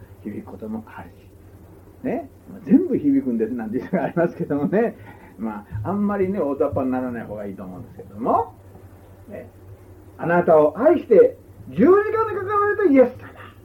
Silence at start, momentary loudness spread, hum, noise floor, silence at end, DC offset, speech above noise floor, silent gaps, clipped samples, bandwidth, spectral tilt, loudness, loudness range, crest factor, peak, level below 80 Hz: 0 s; 23 LU; none; -45 dBFS; 0.15 s; under 0.1%; 25 dB; none; under 0.1%; 16 kHz; -9.5 dB/octave; -20 LUFS; 9 LU; 18 dB; -4 dBFS; -52 dBFS